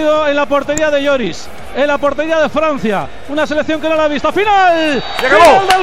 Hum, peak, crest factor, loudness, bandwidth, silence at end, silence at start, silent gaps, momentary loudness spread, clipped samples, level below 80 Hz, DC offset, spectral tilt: none; 0 dBFS; 12 dB; -12 LUFS; 16 kHz; 0 s; 0 s; none; 11 LU; under 0.1%; -40 dBFS; 5%; -3.5 dB/octave